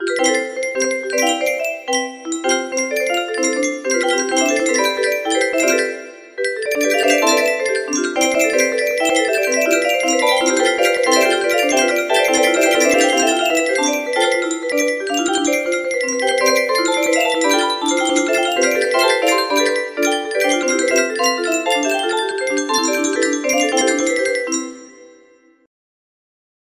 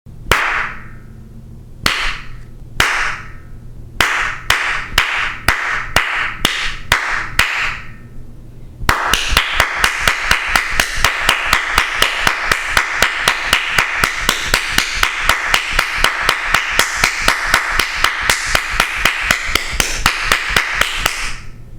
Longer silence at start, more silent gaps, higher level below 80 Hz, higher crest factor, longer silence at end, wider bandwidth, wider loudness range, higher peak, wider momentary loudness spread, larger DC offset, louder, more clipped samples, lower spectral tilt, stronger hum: about the same, 0 s vs 0.05 s; neither; second, -64 dBFS vs -28 dBFS; about the same, 16 dB vs 16 dB; first, 1.6 s vs 0 s; second, 15.5 kHz vs 19 kHz; about the same, 4 LU vs 4 LU; about the same, -2 dBFS vs 0 dBFS; about the same, 6 LU vs 5 LU; neither; about the same, -16 LUFS vs -15 LUFS; neither; about the same, 0 dB/octave vs -1 dB/octave; neither